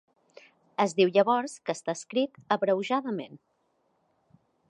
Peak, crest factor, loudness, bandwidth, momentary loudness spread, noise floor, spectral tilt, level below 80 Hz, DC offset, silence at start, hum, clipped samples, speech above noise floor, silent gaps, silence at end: -10 dBFS; 20 dB; -28 LUFS; 11.5 kHz; 13 LU; -72 dBFS; -5 dB/octave; -82 dBFS; under 0.1%; 0.8 s; none; under 0.1%; 45 dB; none; 1.35 s